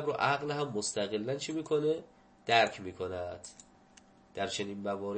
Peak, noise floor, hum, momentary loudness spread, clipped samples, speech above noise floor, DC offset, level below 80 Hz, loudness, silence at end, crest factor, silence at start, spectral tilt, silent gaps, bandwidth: -10 dBFS; -61 dBFS; none; 15 LU; under 0.1%; 28 dB; under 0.1%; -70 dBFS; -33 LUFS; 0 s; 24 dB; 0 s; -3.5 dB/octave; none; 8.8 kHz